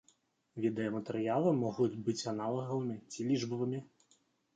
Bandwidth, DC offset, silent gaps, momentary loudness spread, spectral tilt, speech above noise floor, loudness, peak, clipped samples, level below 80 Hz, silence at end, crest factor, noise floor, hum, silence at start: 9.2 kHz; under 0.1%; none; 8 LU; -6.5 dB/octave; 38 dB; -35 LUFS; -18 dBFS; under 0.1%; -78 dBFS; 0.7 s; 18 dB; -73 dBFS; none; 0.55 s